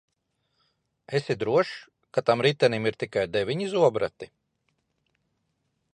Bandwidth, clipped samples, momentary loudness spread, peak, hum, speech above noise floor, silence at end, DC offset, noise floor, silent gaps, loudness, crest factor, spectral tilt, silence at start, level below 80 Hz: 10.5 kHz; under 0.1%; 10 LU; -6 dBFS; none; 51 dB; 1.7 s; under 0.1%; -76 dBFS; none; -26 LUFS; 20 dB; -6 dB/octave; 1.1 s; -64 dBFS